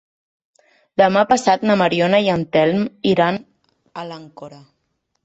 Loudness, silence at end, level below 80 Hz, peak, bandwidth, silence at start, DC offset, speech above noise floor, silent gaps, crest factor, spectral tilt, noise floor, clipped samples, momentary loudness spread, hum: -17 LUFS; 0.7 s; -58 dBFS; -2 dBFS; 8.2 kHz; 1 s; under 0.1%; 54 dB; none; 18 dB; -5.5 dB/octave; -71 dBFS; under 0.1%; 19 LU; none